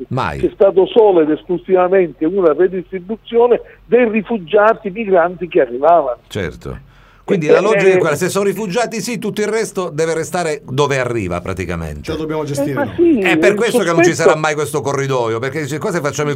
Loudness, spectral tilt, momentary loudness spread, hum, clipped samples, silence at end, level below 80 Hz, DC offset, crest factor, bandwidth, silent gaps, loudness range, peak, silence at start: -15 LUFS; -5.5 dB/octave; 11 LU; none; under 0.1%; 0 s; -44 dBFS; under 0.1%; 14 dB; 16 kHz; none; 4 LU; 0 dBFS; 0 s